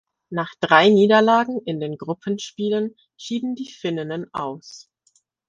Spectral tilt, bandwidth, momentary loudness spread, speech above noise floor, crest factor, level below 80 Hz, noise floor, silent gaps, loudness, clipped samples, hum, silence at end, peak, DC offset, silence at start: -5.5 dB/octave; 7.8 kHz; 16 LU; 44 dB; 20 dB; -66 dBFS; -64 dBFS; none; -21 LUFS; under 0.1%; none; 0.7 s; 0 dBFS; under 0.1%; 0.3 s